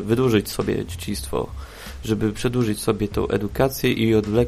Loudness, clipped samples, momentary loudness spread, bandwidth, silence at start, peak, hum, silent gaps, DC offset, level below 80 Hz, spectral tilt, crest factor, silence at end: -22 LUFS; under 0.1%; 10 LU; 15.5 kHz; 0 s; -4 dBFS; none; none; under 0.1%; -38 dBFS; -6 dB/octave; 18 dB; 0 s